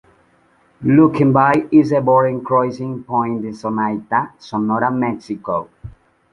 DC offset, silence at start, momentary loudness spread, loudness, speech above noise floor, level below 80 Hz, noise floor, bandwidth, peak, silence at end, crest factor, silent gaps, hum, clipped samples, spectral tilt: under 0.1%; 0.8 s; 11 LU; -17 LUFS; 39 dB; -52 dBFS; -56 dBFS; 7 kHz; 0 dBFS; 0.4 s; 16 dB; none; none; under 0.1%; -9 dB/octave